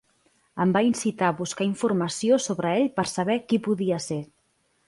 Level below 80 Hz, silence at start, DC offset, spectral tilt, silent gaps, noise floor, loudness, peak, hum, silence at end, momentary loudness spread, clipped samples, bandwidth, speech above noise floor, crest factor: -66 dBFS; 0.55 s; under 0.1%; -5 dB/octave; none; -69 dBFS; -25 LUFS; -10 dBFS; none; 0.65 s; 7 LU; under 0.1%; 11.5 kHz; 45 dB; 16 dB